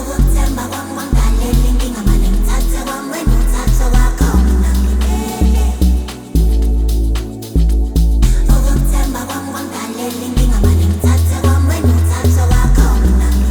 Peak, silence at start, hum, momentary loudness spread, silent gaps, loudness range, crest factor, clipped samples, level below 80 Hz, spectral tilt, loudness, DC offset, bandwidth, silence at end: 0 dBFS; 0 s; none; 8 LU; none; 3 LU; 12 dB; under 0.1%; -14 dBFS; -6 dB/octave; -15 LUFS; under 0.1%; over 20 kHz; 0 s